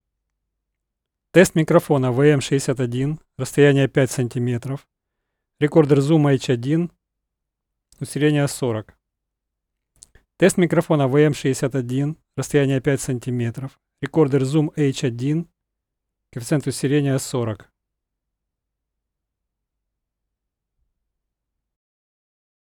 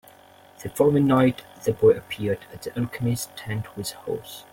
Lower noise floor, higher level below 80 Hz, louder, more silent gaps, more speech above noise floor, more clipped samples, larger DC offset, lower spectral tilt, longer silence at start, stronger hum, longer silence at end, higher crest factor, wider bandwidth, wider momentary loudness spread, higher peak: first, -81 dBFS vs -51 dBFS; about the same, -56 dBFS vs -56 dBFS; first, -20 LUFS vs -24 LUFS; neither; first, 63 dB vs 28 dB; neither; neither; about the same, -6.5 dB/octave vs -6.5 dB/octave; first, 1.35 s vs 0.6 s; neither; first, 5.2 s vs 0.1 s; about the same, 22 dB vs 18 dB; about the same, 17.5 kHz vs 17 kHz; about the same, 14 LU vs 13 LU; first, 0 dBFS vs -6 dBFS